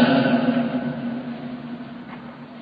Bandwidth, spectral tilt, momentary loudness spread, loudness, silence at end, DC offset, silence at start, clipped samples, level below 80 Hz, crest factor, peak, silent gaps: 5.2 kHz; -9.5 dB/octave; 19 LU; -23 LUFS; 0 s; under 0.1%; 0 s; under 0.1%; -60 dBFS; 18 dB; -4 dBFS; none